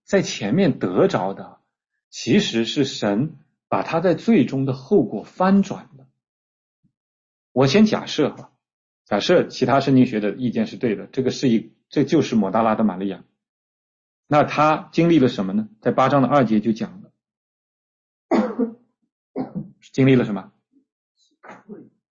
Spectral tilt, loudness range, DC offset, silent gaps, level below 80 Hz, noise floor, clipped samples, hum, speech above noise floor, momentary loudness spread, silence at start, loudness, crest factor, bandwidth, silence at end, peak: -6.5 dB/octave; 4 LU; under 0.1%; 2.04-2.11 s, 6.29-6.83 s, 6.97-7.55 s, 8.73-9.05 s, 13.49-14.23 s, 17.37-18.29 s, 19.12-19.34 s, 20.92-21.15 s; -58 dBFS; -46 dBFS; under 0.1%; none; 27 dB; 13 LU; 0.1 s; -20 LUFS; 16 dB; 7.6 kHz; 0.35 s; -4 dBFS